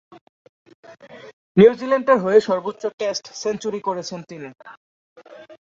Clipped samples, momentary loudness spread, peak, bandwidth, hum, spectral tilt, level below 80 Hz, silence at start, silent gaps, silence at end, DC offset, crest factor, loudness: under 0.1%; 19 LU; -2 dBFS; 7.6 kHz; none; -5.5 dB/octave; -64 dBFS; 0.9 s; 1.33-1.55 s, 2.94-2.98 s, 4.77-5.16 s; 0.05 s; under 0.1%; 20 dB; -19 LUFS